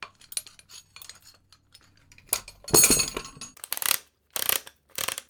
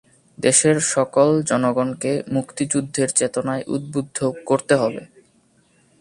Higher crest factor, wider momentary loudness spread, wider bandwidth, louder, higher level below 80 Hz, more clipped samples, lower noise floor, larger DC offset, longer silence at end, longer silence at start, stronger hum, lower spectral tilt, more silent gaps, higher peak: first, 28 dB vs 20 dB; first, 26 LU vs 9 LU; first, over 20 kHz vs 11.5 kHz; second, -24 LUFS vs -20 LUFS; first, -52 dBFS vs -60 dBFS; neither; about the same, -58 dBFS vs -59 dBFS; neither; second, 0.1 s vs 0.95 s; second, 0 s vs 0.4 s; neither; second, -1 dB/octave vs -4 dB/octave; neither; about the same, -2 dBFS vs -2 dBFS